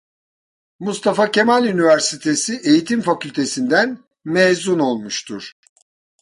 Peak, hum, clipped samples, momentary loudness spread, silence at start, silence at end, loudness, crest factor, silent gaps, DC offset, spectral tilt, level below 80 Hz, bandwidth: -2 dBFS; none; under 0.1%; 12 LU; 0.8 s; 0.7 s; -17 LUFS; 16 dB; none; under 0.1%; -4 dB/octave; -64 dBFS; 11.5 kHz